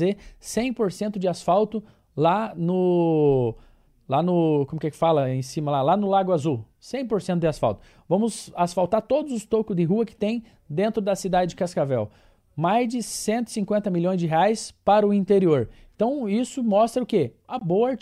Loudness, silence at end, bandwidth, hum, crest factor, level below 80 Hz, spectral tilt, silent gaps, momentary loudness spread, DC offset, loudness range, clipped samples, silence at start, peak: -23 LUFS; 0.05 s; 14.5 kHz; none; 16 dB; -54 dBFS; -6.5 dB/octave; none; 8 LU; under 0.1%; 3 LU; under 0.1%; 0 s; -8 dBFS